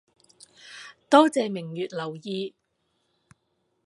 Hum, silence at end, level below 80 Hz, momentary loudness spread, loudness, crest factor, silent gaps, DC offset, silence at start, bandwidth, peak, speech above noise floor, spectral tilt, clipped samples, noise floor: none; 1.4 s; -78 dBFS; 24 LU; -24 LUFS; 26 dB; none; under 0.1%; 0.65 s; 11.5 kHz; -2 dBFS; 50 dB; -5 dB/octave; under 0.1%; -74 dBFS